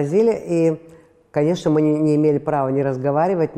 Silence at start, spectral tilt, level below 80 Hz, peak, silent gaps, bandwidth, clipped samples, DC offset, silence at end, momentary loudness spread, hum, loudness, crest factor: 0 s; -8 dB/octave; -56 dBFS; -6 dBFS; none; 9.8 kHz; under 0.1%; under 0.1%; 0 s; 4 LU; none; -19 LUFS; 12 dB